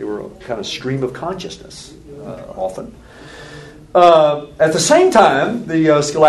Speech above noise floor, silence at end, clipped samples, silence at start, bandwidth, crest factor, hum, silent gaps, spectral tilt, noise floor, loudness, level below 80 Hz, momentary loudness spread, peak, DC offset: 21 dB; 0 s; under 0.1%; 0 s; 12.5 kHz; 16 dB; none; none; -4.5 dB/octave; -36 dBFS; -14 LUFS; -48 dBFS; 25 LU; 0 dBFS; under 0.1%